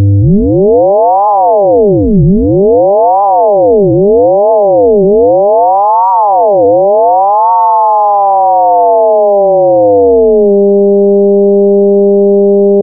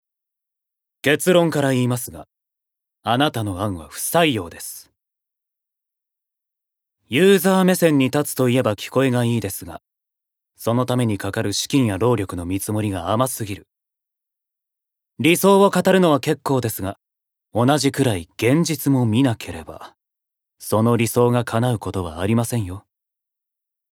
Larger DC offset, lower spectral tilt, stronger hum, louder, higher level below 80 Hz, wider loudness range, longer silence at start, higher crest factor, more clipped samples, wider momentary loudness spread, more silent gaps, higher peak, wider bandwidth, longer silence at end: neither; first, -12.5 dB/octave vs -5.5 dB/octave; neither; first, -7 LUFS vs -19 LUFS; first, -28 dBFS vs -54 dBFS; second, 0 LU vs 5 LU; second, 0 s vs 1.05 s; second, 6 dB vs 20 dB; neither; second, 1 LU vs 14 LU; neither; about the same, 0 dBFS vs 0 dBFS; second, 1.5 kHz vs 18.5 kHz; second, 0 s vs 1.15 s